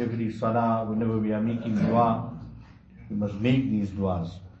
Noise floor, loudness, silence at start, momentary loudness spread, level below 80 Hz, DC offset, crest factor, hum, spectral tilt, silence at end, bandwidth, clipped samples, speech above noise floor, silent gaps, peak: -48 dBFS; -26 LUFS; 0 s; 13 LU; -52 dBFS; under 0.1%; 16 dB; none; -9 dB/octave; 0 s; 7.4 kHz; under 0.1%; 22 dB; none; -10 dBFS